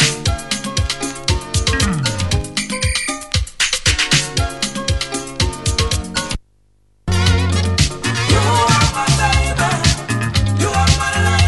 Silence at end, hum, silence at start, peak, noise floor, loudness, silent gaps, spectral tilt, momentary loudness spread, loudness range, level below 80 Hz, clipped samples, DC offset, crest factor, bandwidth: 0 s; none; 0 s; 0 dBFS; -57 dBFS; -17 LUFS; none; -3.5 dB/octave; 7 LU; 4 LU; -26 dBFS; under 0.1%; 0.1%; 16 dB; 12 kHz